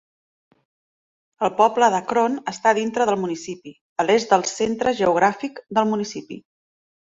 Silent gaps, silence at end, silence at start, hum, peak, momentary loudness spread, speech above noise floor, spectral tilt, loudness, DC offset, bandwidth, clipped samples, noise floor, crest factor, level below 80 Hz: 3.81-3.96 s; 0.7 s; 1.4 s; none; -2 dBFS; 14 LU; over 70 dB; -4 dB/octave; -21 LUFS; under 0.1%; 8 kHz; under 0.1%; under -90 dBFS; 20 dB; -62 dBFS